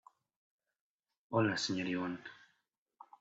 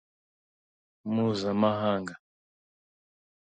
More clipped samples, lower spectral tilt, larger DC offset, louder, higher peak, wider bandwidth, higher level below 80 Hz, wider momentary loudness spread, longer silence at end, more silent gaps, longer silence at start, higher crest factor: neither; second, -4 dB/octave vs -7 dB/octave; neither; second, -36 LUFS vs -28 LUFS; second, -20 dBFS vs -12 dBFS; about the same, 8 kHz vs 8.8 kHz; second, -80 dBFS vs -66 dBFS; about the same, 13 LU vs 13 LU; second, 0.85 s vs 1.25 s; neither; first, 1.3 s vs 1.05 s; about the same, 20 dB vs 20 dB